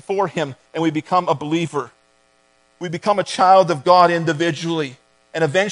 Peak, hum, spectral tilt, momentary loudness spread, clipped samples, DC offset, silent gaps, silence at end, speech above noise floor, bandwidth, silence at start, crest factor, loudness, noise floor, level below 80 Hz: 0 dBFS; none; -5.5 dB/octave; 15 LU; under 0.1%; under 0.1%; none; 0 s; 41 dB; 10.5 kHz; 0.1 s; 18 dB; -18 LUFS; -59 dBFS; -68 dBFS